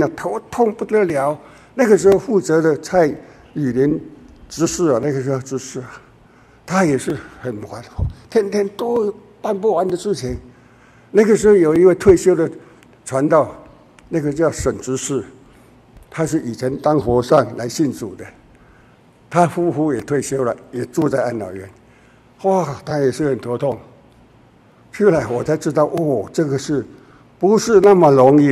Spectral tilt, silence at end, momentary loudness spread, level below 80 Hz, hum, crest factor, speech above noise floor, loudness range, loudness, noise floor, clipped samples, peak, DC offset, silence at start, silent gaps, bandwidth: -6.5 dB/octave; 0 s; 16 LU; -42 dBFS; none; 18 dB; 33 dB; 7 LU; -17 LUFS; -49 dBFS; under 0.1%; 0 dBFS; under 0.1%; 0 s; none; 13.5 kHz